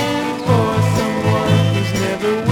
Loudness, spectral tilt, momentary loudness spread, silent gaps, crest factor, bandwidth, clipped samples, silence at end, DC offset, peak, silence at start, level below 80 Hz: -17 LUFS; -6 dB/octave; 4 LU; none; 14 dB; 16.5 kHz; under 0.1%; 0 s; under 0.1%; -2 dBFS; 0 s; -42 dBFS